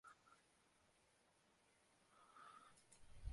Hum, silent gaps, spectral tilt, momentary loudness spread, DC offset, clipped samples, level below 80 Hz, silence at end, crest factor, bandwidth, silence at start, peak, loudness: none; none; -4 dB/octave; 7 LU; under 0.1%; under 0.1%; -68 dBFS; 0 s; 26 dB; 11.5 kHz; 0.05 s; -38 dBFS; -65 LUFS